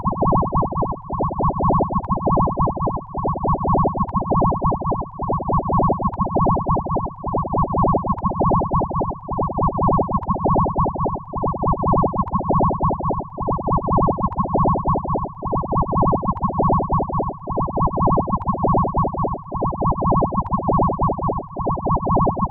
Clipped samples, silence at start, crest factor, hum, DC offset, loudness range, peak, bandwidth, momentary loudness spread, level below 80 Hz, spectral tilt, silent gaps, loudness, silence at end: under 0.1%; 0 s; 12 dB; none; under 0.1%; 1 LU; -6 dBFS; 1.9 kHz; 6 LU; -30 dBFS; -15.5 dB/octave; none; -21 LUFS; 0 s